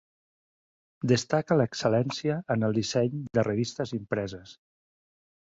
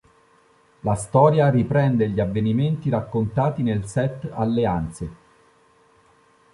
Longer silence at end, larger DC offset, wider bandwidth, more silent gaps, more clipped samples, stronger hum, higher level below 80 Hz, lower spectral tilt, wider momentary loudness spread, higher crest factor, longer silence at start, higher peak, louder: second, 1.05 s vs 1.4 s; neither; second, 8 kHz vs 11.5 kHz; neither; neither; neither; second, -62 dBFS vs -46 dBFS; second, -6 dB/octave vs -8 dB/octave; about the same, 8 LU vs 10 LU; about the same, 20 dB vs 18 dB; first, 1.05 s vs 0.85 s; second, -8 dBFS vs -4 dBFS; second, -28 LUFS vs -21 LUFS